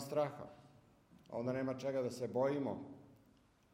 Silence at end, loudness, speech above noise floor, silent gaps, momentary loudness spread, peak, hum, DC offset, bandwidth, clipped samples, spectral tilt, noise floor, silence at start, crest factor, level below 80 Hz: 0.6 s; -40 LUFS; 31 dB; none; 17 LU; -24 dBFS; none; under 0.1%; 16 kHz; under 0.1%; -6.5 dB/octave; -70 dBFS; 0 s; 18 dB; -78 dBFS